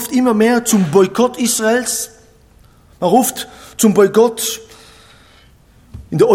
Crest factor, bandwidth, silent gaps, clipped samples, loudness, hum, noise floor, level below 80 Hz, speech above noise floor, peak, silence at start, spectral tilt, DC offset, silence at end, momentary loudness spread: 14 dB; 17 kHz; none; under 0.1%; -14 LUFS; none; -47 dBFS; -50 dBFS; 34 dB; 0 dBFS; 0 s; -4.5 dB/octave; under 0.1%; 0 s; 12 LU